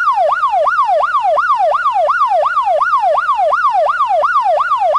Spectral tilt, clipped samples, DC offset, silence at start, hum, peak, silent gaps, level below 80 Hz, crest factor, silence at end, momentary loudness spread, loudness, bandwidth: -1.5 dB/octave; under 0.1%; under 0.1%; 0 s; none; -6 dBFS; none; -52 dBFS; 8 dB; 0 s; 1 LU; -13 LUFS; 11 kHz